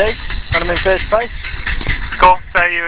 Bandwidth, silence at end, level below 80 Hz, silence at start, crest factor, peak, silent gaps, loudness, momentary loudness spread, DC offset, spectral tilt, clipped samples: 4 kHz; 0 s; -26 dBFS; 0 s; 16 dB; 0 dBFS; none; -15 LUFS; 11 LU; under 0.1%; -8 dB/octave; under 0.1%